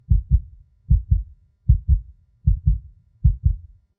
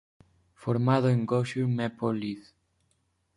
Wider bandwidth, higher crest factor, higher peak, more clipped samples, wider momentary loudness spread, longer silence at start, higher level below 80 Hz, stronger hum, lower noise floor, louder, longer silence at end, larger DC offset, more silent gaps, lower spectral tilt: second, 0.5 kHz vs 10.5 kHz; about the same, 18 dB vs 18 dB; first, -2 dBFS vs -12 dBFS; neither; second, 8 LU vs 13 LU; second, 0.1 s vs 0.6 s; first, -22 dBFS vs -66 dBFS; neither; second, -43 dBFS vs -73 dBFS; first, -23 LUFS vs -28 LUFS; second, 0.4 s vs 0.95 s; neither; neither; first, -13.5 dB/octave vs -8 dB/octave